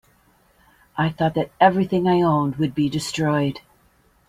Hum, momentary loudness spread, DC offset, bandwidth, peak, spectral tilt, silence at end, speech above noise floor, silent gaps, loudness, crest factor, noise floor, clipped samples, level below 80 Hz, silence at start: none; 8 LU; under 0.1%; 15 kHz; -2 dBFS; -6.5 dB/octave; 0.7 s; 39 dB; none; -21 LUFS; 20 dB; -59 dBFS; under 0.1%; -54 dBFS; 0.95 s